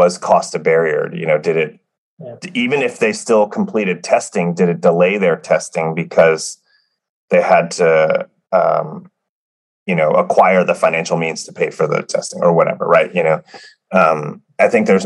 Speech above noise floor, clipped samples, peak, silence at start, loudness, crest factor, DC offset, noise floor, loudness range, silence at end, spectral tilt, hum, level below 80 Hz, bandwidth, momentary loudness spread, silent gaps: 46 dB; under 0.1%; 0 dBFS; 0 s; -15 LUFS; 16 dB; under 0.1%; -61 dBFS; 2 LU; 0 s; -5 dB/octave; none; -66 dBFS; 11.5 kHz; 9 LU; 1.98-2.17 s, 7.09-7.28 s, 9.29-9.86 s